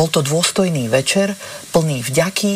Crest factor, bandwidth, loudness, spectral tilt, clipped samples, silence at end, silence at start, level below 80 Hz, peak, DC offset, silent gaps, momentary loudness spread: 14 dB; 15.5 kHz; -17 LUFS; -4 dB/octave; under 0.1%; 0 s; 0 s; -52 dBFS; -4 dBFS; under 0.1%; none; 4 LU